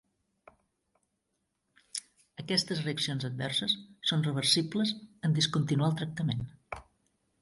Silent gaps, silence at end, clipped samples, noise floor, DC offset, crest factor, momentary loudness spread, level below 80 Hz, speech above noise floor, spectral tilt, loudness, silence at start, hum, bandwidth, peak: none; 0.6 s; under 0.1%; -81 dBFS; under 0.1%; 20 dB; 15 LU; -64 dBFS; 50 dB; -4.5 dB/octave; -30 LUFS; 1.95 s; none; 11.5 kHz; -14 dBFS